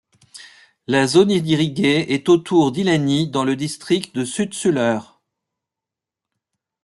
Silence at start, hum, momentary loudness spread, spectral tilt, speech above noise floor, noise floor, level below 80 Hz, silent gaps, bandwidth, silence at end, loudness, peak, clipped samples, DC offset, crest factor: 0.35 s; none; 8 LU; -5.5 dB/octave; 69 dB; -86 dBFS; -60 dBFS; none; 12 kHz; 1.8 s; -18 LUFS; -2 dBFS; under 0.1%; under 0.1%; 18 dB